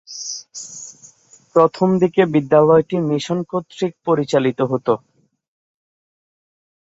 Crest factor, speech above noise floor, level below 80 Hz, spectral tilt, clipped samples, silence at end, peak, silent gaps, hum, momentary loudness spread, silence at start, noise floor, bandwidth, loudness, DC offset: 18 dB; 33 dB; -62 dBFS; -6 dB/octave; under 0.1%; 1.85 s; -2 dBFS; none; none; 16 LU; 0.1 s; -49 dBFS; 8 kHz; -18 LUFS; under 0.1%